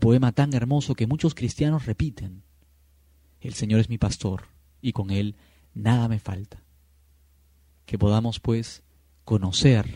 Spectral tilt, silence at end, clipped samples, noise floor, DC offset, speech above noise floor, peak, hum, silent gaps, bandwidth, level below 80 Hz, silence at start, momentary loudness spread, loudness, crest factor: -6.5 dB/octave; 0 s; under 0.1%; -59 dBFS; under 0.1%; 36 dB; -6 dBFS; none; none; 11 kHz; -44 dBFS; 0 s; 17 LU; -25 LUFS; 20 dB